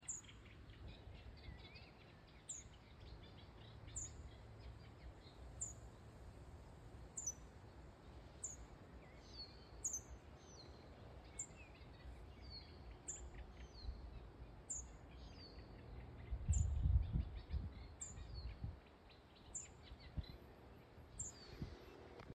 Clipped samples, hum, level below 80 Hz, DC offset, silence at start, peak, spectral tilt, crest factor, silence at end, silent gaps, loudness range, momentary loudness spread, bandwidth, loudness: under 0.1%; none; -52 dBFS; under 0.1%; 0 s; -26 dBFS; -4 dB/octave; 24 dB; 0 s; none; 10 LU; 15 LU; 13.5 kHz; -51 LUFS